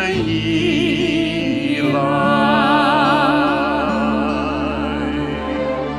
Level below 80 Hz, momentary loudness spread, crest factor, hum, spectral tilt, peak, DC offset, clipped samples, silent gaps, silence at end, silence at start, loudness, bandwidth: -38 dBFS; 7 LU; 14 dB; none; -6 dB/octave; -2 dBFS; under 0.1%; under 0.1%; none; 0 s; 0 s; -17 LUFS; 11.5 kHz